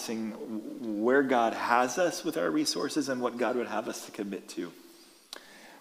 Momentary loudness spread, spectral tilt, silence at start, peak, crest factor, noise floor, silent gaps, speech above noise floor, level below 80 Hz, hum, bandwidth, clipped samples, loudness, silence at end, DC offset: 16 LU; -3.5 dB/octave; 0 s; -10 dBFS; 22 dB; -51 dBFS; none; 21 dB; -80 dBFS; none; 15.5 kHz; under 0.1%; -30 LUFS; 0 s; under 0.1%